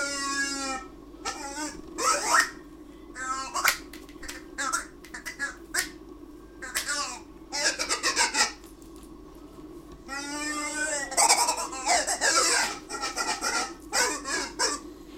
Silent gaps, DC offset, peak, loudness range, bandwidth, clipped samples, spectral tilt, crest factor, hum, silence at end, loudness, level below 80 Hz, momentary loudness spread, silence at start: none; under 0.1%; -6 dBFS; 7 LU; 16.5 kHz; under 0.1%; 0 dB/octave; 24 dB; none; 0 s; -27 LUFS; -54 dBFS; 23 LU; 0 s